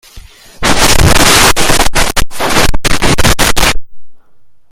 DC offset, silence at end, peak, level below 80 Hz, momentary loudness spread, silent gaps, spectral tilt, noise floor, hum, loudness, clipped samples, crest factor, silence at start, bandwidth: under 0.1%; 0.25 s; 0 dBFS; -18 dBFS; 8 LU; none; -2.5 dB/octave; -41 dBFS; none; -9 LUFS; 1%; 8 dB; 0.15 s; 17.5 kHz